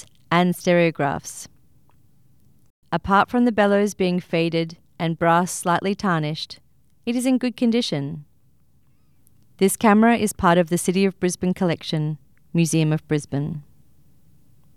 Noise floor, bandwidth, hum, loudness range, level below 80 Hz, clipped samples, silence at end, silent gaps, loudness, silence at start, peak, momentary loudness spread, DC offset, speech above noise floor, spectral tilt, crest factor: -62 dBFS; 15.5 kHz; none; 5 LU; -54 dBFS; under 0.1%; 1.15 s; 2.70-2.82 s; -21 LUFS; 0.3 s; -4 dBFS; 13 LU; 0.2%; 41 dB; -5.5 dB/octave; 18 dB